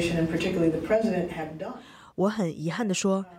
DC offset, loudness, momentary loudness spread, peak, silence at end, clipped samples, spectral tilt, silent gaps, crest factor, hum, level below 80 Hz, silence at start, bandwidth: under 0.1%; -27 LUFS; 13 LU; -12 dBFS; 0 s; under 0.1%; -5.5 dB/octave; none; 16 dB; none; -54 dBFS; 0 s; 16 kHz